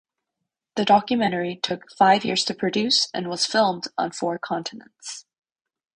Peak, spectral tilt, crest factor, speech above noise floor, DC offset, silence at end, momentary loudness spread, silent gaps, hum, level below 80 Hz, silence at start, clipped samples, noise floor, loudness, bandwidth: -4 dBFS; -3.5 dB/octave; 20 dB; 60 dB; under 0.1%; 0.75 s; 17 LU; none; none; -66 dBFS; 0.75 s; under 0.1%; -83 dBFS; -22 LUFS; 10.5 kHz